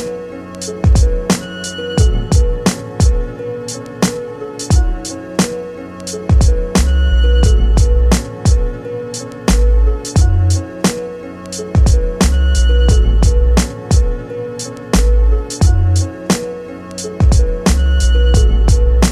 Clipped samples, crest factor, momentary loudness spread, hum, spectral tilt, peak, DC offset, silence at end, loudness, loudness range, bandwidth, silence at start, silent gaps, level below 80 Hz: under 0.1%; 10 dB; 13 LU; none; -5.5 dB/octave; -2 dBFS; under 0.1%; 0 s; -15 LUFS; 3 LU; 13.5 kHz; 0 s; none; -14 dBFS